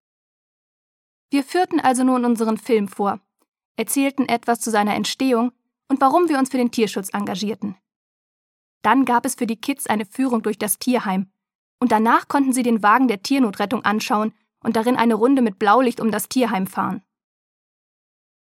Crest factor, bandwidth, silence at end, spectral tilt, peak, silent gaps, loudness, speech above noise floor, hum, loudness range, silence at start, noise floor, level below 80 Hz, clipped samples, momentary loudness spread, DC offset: 20 dB; 16.5 kHz; 1.55 s; -4.5 dB/octave; 0 dBFS; 3.48-3.53 s, 3.65-3.75 s, 7.96-8.81 s, 11.55-11.78 s; -20 LUFS; over 71 dB; none; 3 LU; 1.3 s; under -90 dBFS; -70 dBFS; under 0.1%; 9 LU; under 0.1%